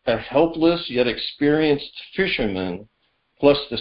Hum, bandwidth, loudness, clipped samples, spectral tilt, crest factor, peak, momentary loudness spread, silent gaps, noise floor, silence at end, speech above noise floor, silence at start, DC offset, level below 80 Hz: none; 5.6 kHz; -21 LUFS; under 0.1%; -10.5 dB/octave; 18 dB; -4 dBFS; 9 LU; none; -60 dBFS; 0 s; 39 dB; 0.05 s; under 0.1%; -46 dBFS